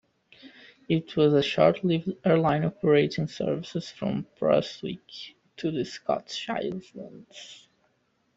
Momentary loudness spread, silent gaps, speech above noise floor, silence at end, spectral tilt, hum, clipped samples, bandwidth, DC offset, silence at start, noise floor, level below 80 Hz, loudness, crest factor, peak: 21 LU; none; 44 dB; 0.8 s; -6.5 dB/octave; none; under 0.1%; 8 kHz; under 0.1%; 0.45 s; -71 dBFS; -64 dBFS; -26 LUFS; 20 dB; -6 dBFS